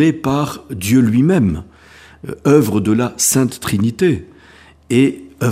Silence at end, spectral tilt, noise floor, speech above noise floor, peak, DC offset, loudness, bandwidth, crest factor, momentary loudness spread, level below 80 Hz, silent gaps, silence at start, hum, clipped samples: 0 s; -5.5 dB/octave; -45 dBFS; 30 dB; 0 dBFS; under 0.1%; -15 LUFS; 15.5 kHz; 16 dB; 11 LU; -44 dBFS; none; 0 s; none; under 0.1%